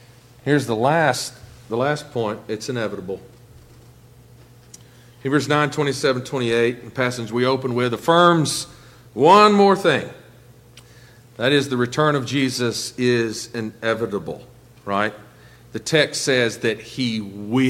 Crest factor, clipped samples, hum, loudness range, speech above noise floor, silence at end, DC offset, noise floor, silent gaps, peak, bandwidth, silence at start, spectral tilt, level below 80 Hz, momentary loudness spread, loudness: 20 dB; under 0.1%; none; 10 LU; 28 dB; 0 s; under 0.1%; -47 dBFS; none; 0 dBFS; 16.5 kHz; 0.45 s; -4.5 dB/octave; -58 dBFS; 15 LU; -20 LUFS